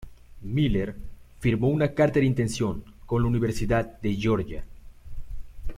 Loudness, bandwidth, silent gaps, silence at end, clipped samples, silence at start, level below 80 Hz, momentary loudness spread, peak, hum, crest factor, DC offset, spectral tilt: -26 LUFS; 15 kHz; none; 0 s; under 0.1%; 0 s; -38 dBFS; 22 LU; -8 dBFS; none; 18 dB; under 0.1%; -7 dB/octave